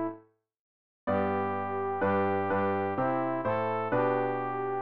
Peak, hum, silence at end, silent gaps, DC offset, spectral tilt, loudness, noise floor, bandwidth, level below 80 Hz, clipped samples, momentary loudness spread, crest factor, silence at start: -16 dBFS; none; 0 s; 0.60-1.07 s; 0.3%; -6 dB/octave; -30 LUFS; -55 dBFS; 5.2 kHz; -68 dBFS; under 0.1%; 5 LU; 14 dB; 0 s